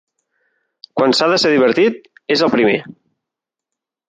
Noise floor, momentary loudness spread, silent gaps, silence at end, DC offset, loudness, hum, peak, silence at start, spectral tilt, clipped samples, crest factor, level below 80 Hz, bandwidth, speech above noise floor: -84 dBFS; 9 LU; none; 1.15 s; under 0.1%; -15 LUFS; none; -2 dBFS; 0.95 s; -4.5 dB/octave; under 0.1%; 16 dB; -64 dBFS; 9.4 kHz; 70 dB